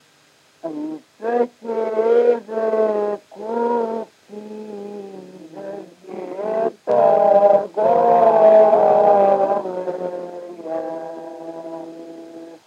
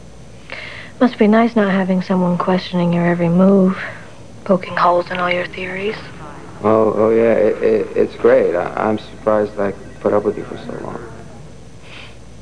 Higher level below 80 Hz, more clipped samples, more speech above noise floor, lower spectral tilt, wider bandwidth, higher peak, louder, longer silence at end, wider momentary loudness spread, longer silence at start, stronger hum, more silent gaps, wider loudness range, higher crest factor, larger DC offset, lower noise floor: second, -82 dBFS vs -48 dBFS; neither; first, 31 dB vs 23 dB; about the same, -7 dB/octave vs -8 dB/octave; second, 7.6 kHz vs 10 kHz; about the same, -2 dBFS vs 0 dBFS; about the same, -17 LUFS vs -16 LUFS; about the same, 0.1 s vs 0 s; first, 22 LU vs 19 LU; first, 0.65 s vs 0 s; neither; neither; first, 13 LU vs 5 LU; about the same, 16 dB vs 16 dB; second, under 0.1% vs 1%; first, -55 dBFS vs -39 dBFS